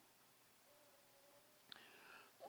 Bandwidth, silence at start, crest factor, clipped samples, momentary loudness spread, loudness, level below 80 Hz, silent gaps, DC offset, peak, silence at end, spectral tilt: over 20 kHz; 0 s; 30 dB; under 0.1%; 9 LU; -65 LUFS; under -90 dBFS; none; under 0.1%; -34 dBFS; 0 s; -1.5 dB/octave